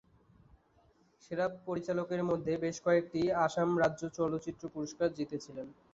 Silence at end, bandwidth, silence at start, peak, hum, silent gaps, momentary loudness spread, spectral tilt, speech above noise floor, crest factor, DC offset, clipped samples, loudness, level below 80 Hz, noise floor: 0.2 s; 7.8 kHz; 1.3 s; -16 dBFS; none; none; 11 LU; -6 dB/octave; 34 dB; 18 dB; under 0.1%; under 0.1%; -34 LUFS; -66 dBFS; -68 dBFS